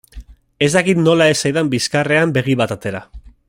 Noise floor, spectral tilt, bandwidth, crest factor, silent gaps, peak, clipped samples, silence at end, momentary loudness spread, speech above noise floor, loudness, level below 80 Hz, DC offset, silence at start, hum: -38 dBFS; -5 dB/octave; 16 kHz; 16 dB; none; -2 dBFS; under 0.1%; 0.2 s; 10 LU; 22 dB; -15 LUFS; -44 dBFS; under 0.1%; 0.15 s; none